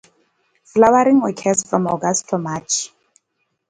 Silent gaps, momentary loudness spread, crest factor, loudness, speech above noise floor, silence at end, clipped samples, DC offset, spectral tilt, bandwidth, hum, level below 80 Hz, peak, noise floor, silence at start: none; 10 LU; 18 dB; -17 LUFS; 55 dB; 0.85 s; under 0.1%; under 0.1%; -4.5 dB/octave; 9.8 kHz; none; -58 dBFS; 0 dBFS; -72 dBFS; 0.75 s